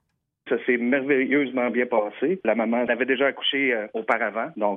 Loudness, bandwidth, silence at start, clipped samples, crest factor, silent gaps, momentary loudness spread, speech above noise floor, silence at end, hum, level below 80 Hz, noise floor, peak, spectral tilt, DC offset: -23 LUFS; 3.8 kHz; 0.45 s; under 0.1%; 16 dB; none; 5 LU; 25 dB; 0 s; none; -74 dBFS; -49 dBFS; -8 dBFS; -7 dB/octave; under 0.1%